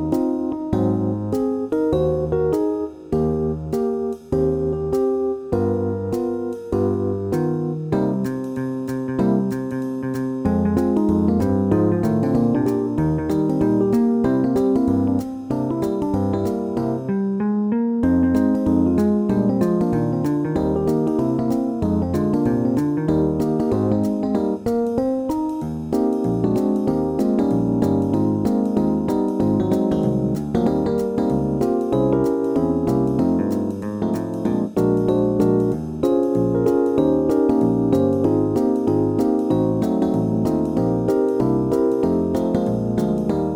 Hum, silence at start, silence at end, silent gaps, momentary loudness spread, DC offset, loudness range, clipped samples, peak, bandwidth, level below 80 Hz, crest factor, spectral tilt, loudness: none; 0 s; 0 s; none; 5 LU; under 0.1%; 4 LU; under 0.1%; -6 dBFS; 16.5 kHz; -42 dBFS; 14 dB; -9 dB/octave; -20 LUFS